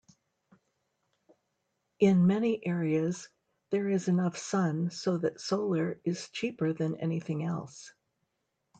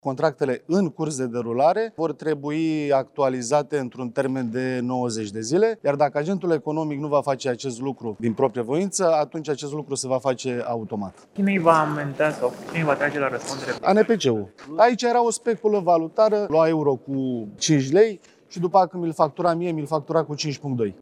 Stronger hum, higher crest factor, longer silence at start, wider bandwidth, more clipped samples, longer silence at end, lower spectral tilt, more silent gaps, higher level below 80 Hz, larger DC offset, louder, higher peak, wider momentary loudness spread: neither; about the same, 20 dB vs 20 dB; first, 2 s vs 0.05 s; second, 9 kHz vs 12.5 kHz; neither; first, 0.9 s vs 0.1 s; about the same, -6.5 dB/octave vs -5.5 dB/octave; neither; second, -74 dBFS vs -68 dBFS; neither; second, -30 LUFS vs -23 LUFS; second, -12 dBFS vs -2 dBFS; about the same, 9 LU vs 9 LU